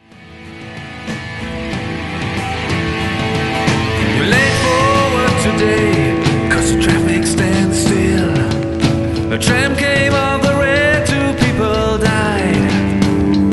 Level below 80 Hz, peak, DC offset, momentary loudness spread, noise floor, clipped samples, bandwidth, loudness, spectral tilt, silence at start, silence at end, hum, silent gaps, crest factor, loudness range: -30 dBFS; 0 dBFS; under 0.1%; 10 LU; -36 dBFS; under 0.1%; 12 kHz; -14 LUFS; -5 dB/octave; 0.2 s; 0 s; none; none; 14 dB; 5 LU